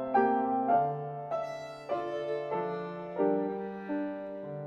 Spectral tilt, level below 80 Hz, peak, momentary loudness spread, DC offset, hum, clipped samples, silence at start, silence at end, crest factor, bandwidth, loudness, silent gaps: -8 dB/octave; -72 dBFS; -14 dBFS; 11 LU; under 0.1%; none; under 0.1%; 0 s; 0 s; 18 dB; 8.4 kHz; -32 LUFS; none